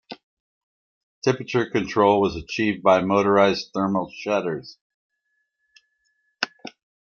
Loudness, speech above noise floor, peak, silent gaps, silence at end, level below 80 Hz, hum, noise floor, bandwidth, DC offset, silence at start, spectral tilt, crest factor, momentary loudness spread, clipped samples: -22 LUFS; 54 dB; -2 dBFS; 0.23-1.22 s, 4.81-5.10 s; 0.35 s; -56 dBFS; none; -74 dBFS; 7.2 kHz; under 0.1%; 0.1 s; -6 dB/octave; 22 dB; 14 LU; under 0.1%